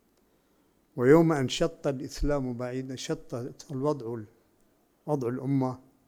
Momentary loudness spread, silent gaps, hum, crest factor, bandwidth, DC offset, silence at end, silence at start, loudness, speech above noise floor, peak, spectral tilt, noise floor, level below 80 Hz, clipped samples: 17 LU; none; none; 22 dB; 16 kHz; under 0.1%; 0.3 s; 0.95 s; -29 LUFS; 40 dB; -8 dBFS; -6.5 dB/octave; -67 dBFS; -44 dBFS; under 0.1%